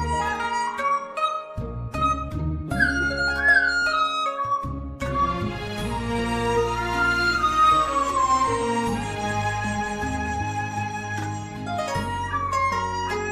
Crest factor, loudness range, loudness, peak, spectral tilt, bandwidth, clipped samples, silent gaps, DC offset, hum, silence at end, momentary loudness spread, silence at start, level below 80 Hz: 16 dB; 5 LU; -24 LUFS; -8 dBFS; -4.5 dB/octave; 15.5 kHz; under 0.1%; none; under 0.1%; none; 0 s; 11 LU; 0 s; -40 dBFS